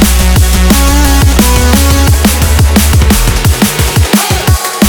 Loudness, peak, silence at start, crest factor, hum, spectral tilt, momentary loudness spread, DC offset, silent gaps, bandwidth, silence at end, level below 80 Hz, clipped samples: -8 LUFS; 0 dBFS; 0 s; 6 dB; none; -4.5 dB/octave; 2 LU; under 0.1%; none; over 20 kHz; 0 s; -10 dBFS; 1%